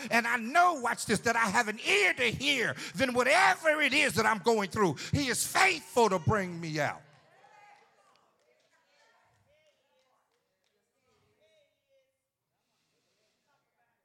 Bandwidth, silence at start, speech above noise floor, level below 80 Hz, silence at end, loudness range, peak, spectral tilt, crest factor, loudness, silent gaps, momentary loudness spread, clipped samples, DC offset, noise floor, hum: 16 kHz; 0 s; 56 dB; -66 dBFS; 7.05 s; 10 LU; -12 dBFS; -3.5 dB/octave; 20 dB; -27 LUFS; none; 8 LU; under 0.1%; under 0.1%; -84 dBFS; none